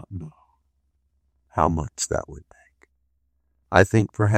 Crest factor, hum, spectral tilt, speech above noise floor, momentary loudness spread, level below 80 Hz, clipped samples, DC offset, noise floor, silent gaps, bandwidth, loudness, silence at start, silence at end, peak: 24 dB; none; -5.5 dB/octave; 50 dB; 20 LU; -46 dBFS; under 0.1%; under 0.1%; -71 dBFS; none; 14 kHz; -22 LUFS; 0.1 s; 0 s; 0 dBFS